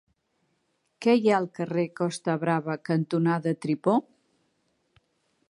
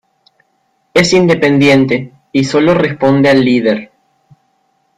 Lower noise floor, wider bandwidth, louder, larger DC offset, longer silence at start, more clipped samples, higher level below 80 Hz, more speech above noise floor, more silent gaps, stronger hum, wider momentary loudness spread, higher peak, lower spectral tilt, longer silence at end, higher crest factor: first, -74 dBFS vs -60 dBFS; about the same, 11.5 kHz vs 11.5 kHz; second, -26 LUFS vs -11 LUFS; neither; about the same, 1 s vs 0.95 s; neither; second, -76 dBFS vs -48 dBFS; about the same, 48 dB vs 50 dB; neither; neither; about the same, 7 LU vs 7 LU; second, -8 dBFS vs 0 dBFS; first, -7 dB/octave vs -5.5 dB/octave; first, 1.5 s vs 1.1 s; first, 20 dB vs 12 dB